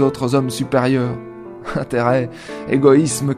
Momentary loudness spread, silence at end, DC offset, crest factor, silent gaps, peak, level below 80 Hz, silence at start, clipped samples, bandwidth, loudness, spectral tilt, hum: 17 LU; 0 s; under 0.1%; 18 dB; none; 0 dBFS; -50 dBFS; 0 s; under 0.1%; 14 kHz; -17 LUFS; -6 dB/octave; none